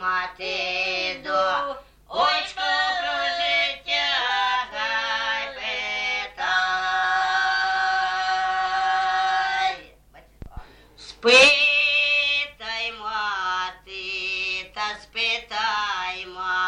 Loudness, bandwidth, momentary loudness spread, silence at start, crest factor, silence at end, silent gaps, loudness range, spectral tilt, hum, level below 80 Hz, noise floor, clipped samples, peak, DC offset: -22 LUFS; 11.5 kHz; 10 LU; 0 s; 20 dB; 0 s; none; 7 LU; -0.5 dB/octave; none; -54 dBFS; -52 dBFS; under 0.1%; -4 dBFS; under 0.1%